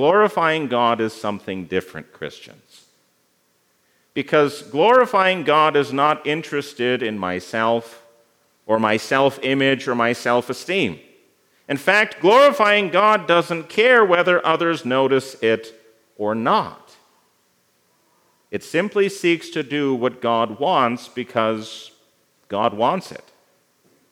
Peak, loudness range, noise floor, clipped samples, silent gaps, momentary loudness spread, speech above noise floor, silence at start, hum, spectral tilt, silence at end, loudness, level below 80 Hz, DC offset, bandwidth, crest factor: 0 dBFS; 9 LU; -64 dBFS; under 0.1%; none; 13 LU; 45 dB; 0 s; none; -5 dB/octave; 0.95 s; -19 LUFS; -72 dBFS; under 0.1%; 16.5 kHz; 20 dB